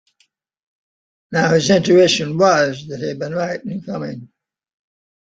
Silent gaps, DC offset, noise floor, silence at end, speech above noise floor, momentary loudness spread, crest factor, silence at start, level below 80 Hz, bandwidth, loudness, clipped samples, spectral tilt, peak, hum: none; under 0.1%; -63 dBFS; 1.05 s; 47 dB; 14 LU; 18 dB; 1.3 s; -58 dBFS; 9 kHz; -17 LUFS; under 0.1%; -5 dB/octave; -2 dBFS; none